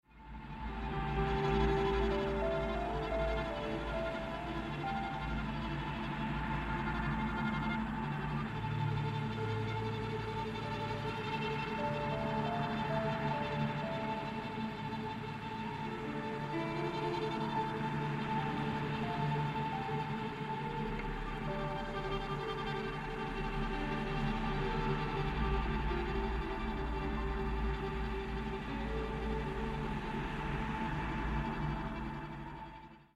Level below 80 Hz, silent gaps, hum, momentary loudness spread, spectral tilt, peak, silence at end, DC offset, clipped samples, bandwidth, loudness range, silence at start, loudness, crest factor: -44 dBFS; none; none; 5 LU; -7 dB/octave; -18 dBFS; 0.1 s; under 0.1%; under 0.1%; 12 kHz; 3 LU; 0.15 s; -37 LUFS; 18 dB